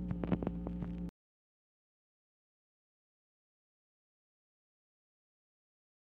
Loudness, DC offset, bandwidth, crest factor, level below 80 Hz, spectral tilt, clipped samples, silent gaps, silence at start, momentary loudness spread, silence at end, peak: -40 LUFS; under 0.1%; 4.1 kHz; 26 dB; -54 dBFS; -10.5 dB/octave; under 0.1%; none; 0 s; 9 LU; 5.05 s; -20 dBFS